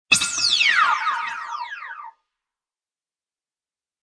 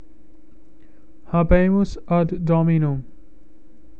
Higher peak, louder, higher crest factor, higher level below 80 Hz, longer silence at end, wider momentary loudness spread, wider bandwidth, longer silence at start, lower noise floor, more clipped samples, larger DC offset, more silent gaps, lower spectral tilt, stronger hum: about the same, -2 dBFS vs 0 dBFS; about the same, -18 LUFS vs -20 LUFS; about the same, 22 dB vs 20 dB; second, -68 dBFS vs -32 dBFS; first, 1.95 s vs 0.95 s; first, 19 LU vs 8 LU; first, 11 kHz vs 7 kHz; second, 0.1 s vs 1.3 s; first, under -90 dBFS vs -51 dBFS; neither; second, under 0.1% vs 2%; neither; second, 1.5 dB/octave vs -9.5 dB/octave; neither